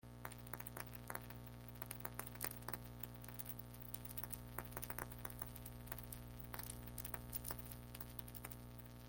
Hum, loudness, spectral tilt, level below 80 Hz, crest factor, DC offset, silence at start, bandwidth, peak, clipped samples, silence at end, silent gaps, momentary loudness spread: 60 Hz at -55 dBFS; -50 LUFS; -4 dB/octave; -60 dBFS; 30 dB; under 0.1%; 0.05 s; 17 kHz; -22 dBFS; under 0.1%; 0 s; none; 6 LU